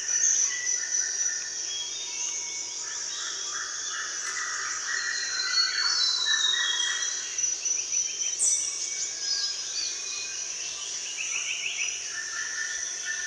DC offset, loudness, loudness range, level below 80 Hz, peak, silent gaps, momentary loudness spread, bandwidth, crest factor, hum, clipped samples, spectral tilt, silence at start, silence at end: under 0.1%; -26 LUFS; 5 LU; -72 dBFS; -12 dBFS; none; 8 LU; 11 kHz; 18 dB; none; under 0.1%; 4 dB/octave; 0 s; 0 s